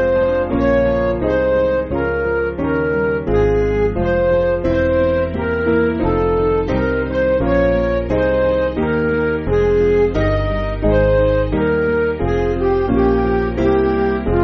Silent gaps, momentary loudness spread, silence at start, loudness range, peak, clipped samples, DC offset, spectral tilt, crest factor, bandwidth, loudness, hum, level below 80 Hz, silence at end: none; 3 LU; 0 s; 1 LU; -4 dBFS; under 0.1%; under 0.1%; -6.5 dB/octave; 12 dB; 6.2 kHz; -17 LUFS; none; -26 dBFS; 0 s